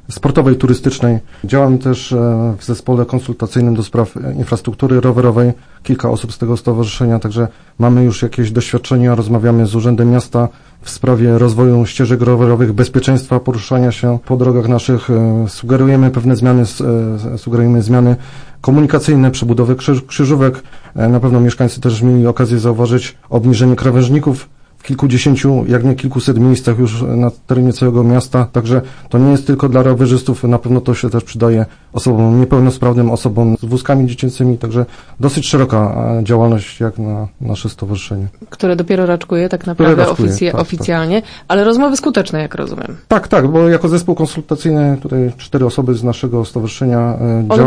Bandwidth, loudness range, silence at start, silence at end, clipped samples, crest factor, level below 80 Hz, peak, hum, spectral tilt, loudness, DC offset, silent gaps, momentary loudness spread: 10.5 kHz; 3 LU; 0.1 s; 0 s; under 0.1%; 12 dB; -38 dBFS; 0 dBFS; none; -7.5 dB/octave; -13 LUFS; under 0.1%; none; 8 LU